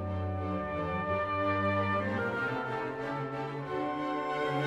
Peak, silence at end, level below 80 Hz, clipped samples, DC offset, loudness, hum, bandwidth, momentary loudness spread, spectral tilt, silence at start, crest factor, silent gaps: -20 dBFS; 0 s; -58 dBFS; under 0.1%; under 0.1%; -33 LUFS; none; 10 kHz; 6 LU; -7.5 dB/octave; 0 s; 14 dB; none